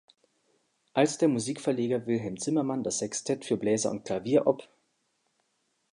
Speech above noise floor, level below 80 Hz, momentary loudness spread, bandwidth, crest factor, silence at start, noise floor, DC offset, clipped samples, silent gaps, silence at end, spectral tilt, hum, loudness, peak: 48 dB; -70 dBFS; 6 LU; 11 kHz; 20 dB; 0.95 s; -76 dBFS; under 0.1%; under 0.1%; none; 1.3 s; -5 dB/octave; none; -29 LUFS; -10 dBFS